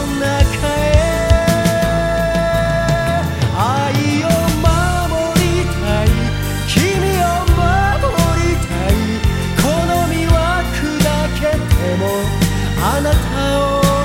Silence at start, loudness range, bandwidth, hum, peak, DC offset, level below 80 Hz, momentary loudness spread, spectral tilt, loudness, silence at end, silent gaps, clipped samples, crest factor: 0 s; 1 LU; 16.5 kHz; none; 0 dBFS; under 0.1%; -22 dBFS; 3 LU; -5.5 dB/octave; -15 LUFS; 0 s; none; under 0.1%; 14 dB